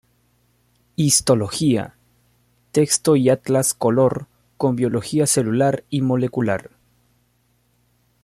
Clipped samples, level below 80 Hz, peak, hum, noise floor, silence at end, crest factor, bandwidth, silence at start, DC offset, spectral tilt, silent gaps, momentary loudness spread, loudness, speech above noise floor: under 0.1%; -56 dBFS; -2 dBFS; 60 Hz at -45 dBFS; -63 dBFS; 1.65 s; 18 dB; 16 kHz; 1 s; under 0.1%; -5 dB/octave; none; 8 LU; -19 LUFS; 45 dB